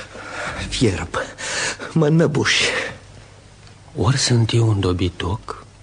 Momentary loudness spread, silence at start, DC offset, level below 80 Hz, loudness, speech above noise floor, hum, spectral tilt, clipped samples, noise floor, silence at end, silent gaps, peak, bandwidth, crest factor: 13 LU; 0 s; under 0.1%; -42 dBFS; -19 LUFS; 26 dB; none; -4.5 dB/octave; under 0.1%; -44 dBFS; 0.2 s; none; -4 dBFS; 10 kHz; 16 dB